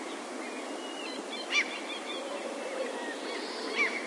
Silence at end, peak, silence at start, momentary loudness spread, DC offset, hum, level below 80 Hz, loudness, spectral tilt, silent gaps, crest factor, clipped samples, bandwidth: 0 s; -16 dBFS; 0 s; 9 LU; under 0.1%; none; under -90 dBFS; -34 LUFS; -1 dB/octave; none; 20 dB; under 0.1%; 11.5 kHz